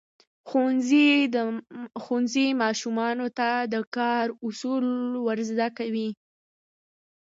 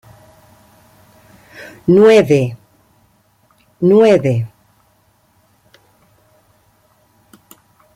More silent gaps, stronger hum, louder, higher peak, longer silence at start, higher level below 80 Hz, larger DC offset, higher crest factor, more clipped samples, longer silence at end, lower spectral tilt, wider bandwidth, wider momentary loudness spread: first, 3.87-3.92 s vs none; neither; second, -25 LUFS vs -12 LUFS; second, -10 dBFS vs -2 dBFS; second, 0.45 s vs 1.6 s; second, -80 dBFS vs -58 dBFS; neither; about the same, 16 dB vs 16 dB; neither; second, 1.15 s vs 3.5 s; second, -4 dB/octave vs -7.5 dB/octave; second, 7.8 kHz vs 15.5 kHz; second, 11 LU vs 21 LU